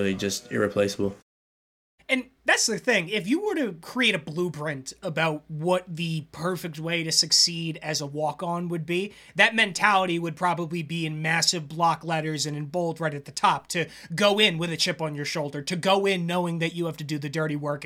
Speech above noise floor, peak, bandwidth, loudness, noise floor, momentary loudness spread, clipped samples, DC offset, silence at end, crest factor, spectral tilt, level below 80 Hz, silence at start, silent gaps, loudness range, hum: over 64 dB; -4 dBFS; 16.5 kHz; -25 LUFS; under -90 dBFS; 10 LU; under 0.1%; under 0.1%; 0 s; 22 dB; -3.5 dB/octave; -64 dBFS; 0 s; 1.22-1.98 s; 3 LU; none